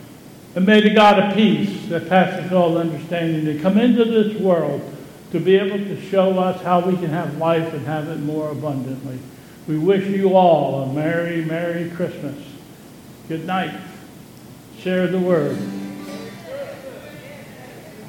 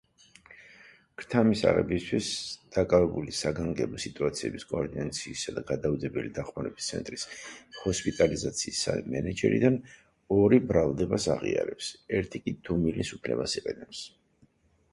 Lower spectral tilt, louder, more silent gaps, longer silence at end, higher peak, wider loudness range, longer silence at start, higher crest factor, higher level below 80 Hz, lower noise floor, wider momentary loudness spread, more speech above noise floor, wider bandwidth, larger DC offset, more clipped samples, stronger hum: first, -7 dB/octave vs -5 dB/octave; first, -19 LUFS vs -29 LUFS; neither; second, 0 s vs 0.85 s; first, 0 dBFS vs -8 dBFS; about the same, 8 LU vs 6 LU; second, 0 s vs 0.5 s; about the same, 18 dB vs 22 dB; second, -60 dBFS vs -50 dBFS; second, -41 dBFS vs -65 dBFS; first, 21 LU vs 13 LU; second, 23 dB vs 36 dB; first, 16.5 kHz vs 11.5 kHz; neither; neither; neither